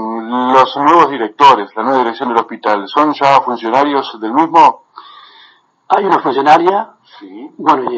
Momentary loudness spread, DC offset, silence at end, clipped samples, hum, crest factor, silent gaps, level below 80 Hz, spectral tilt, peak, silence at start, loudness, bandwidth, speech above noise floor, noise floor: 9 LU; under 0.1%; 0 s; 0.1%; none; 12 dB; none; -72 dBFS; -5 dB/octave; 0 dBFS; 0 s; -12 LUFS; 8 kHz; 35 dB; -47 dBFS